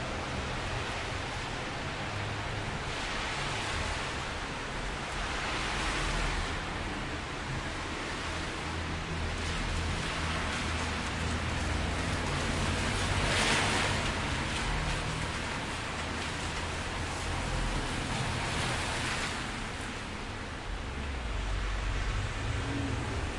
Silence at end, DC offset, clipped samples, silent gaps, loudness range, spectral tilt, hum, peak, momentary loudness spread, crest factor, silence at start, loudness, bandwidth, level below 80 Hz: 0 s; under 0.1%; under 0.1%; none; 5 LU; -4 dB/octave; none; -16 dBFS; 6 LU; 18 dB; 0 s; -33 LUFS; 11.5 kHz; -40 dBFS